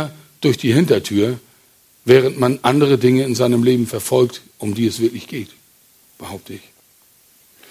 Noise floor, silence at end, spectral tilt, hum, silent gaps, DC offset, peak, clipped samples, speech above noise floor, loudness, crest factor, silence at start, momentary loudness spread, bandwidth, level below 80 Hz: -53 dBFS; 1.15 s; -6 dB/octave; none; none; under 0.1%; 0 dBFS; under 0.1%; 37 dB; -16 LUFS; 18 dB; 0 s; 20 LU; 16 kHz; -52 dBFS